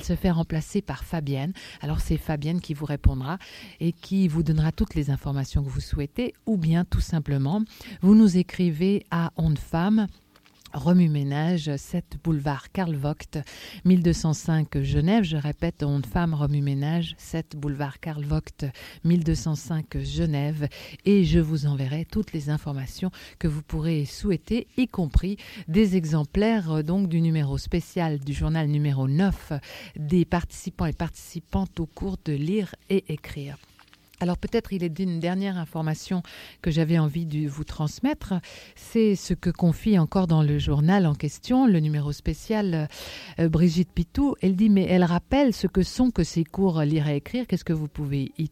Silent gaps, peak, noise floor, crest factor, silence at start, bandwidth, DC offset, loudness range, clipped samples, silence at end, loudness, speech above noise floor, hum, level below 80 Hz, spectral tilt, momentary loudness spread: none; -4 dBFS; -55 dBFS; 20 dB; 0 s; 15 kHz; under 0.1%; 6 LU; under 0.1%; 0 s; -25 LUFS; 31 dB; none; -38 dBFS; -7.5 dB/octave; 11 LU